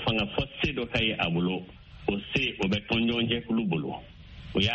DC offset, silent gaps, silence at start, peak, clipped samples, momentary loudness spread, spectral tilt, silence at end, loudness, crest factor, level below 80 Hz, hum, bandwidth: under 0.1%; none; 0 s; -10 dBFS; under 0.1%; 11 LU; -3.5 dB/octave; 0 s; -28 LUFS; 20 dB; -48 dBFS; none; 8 kHz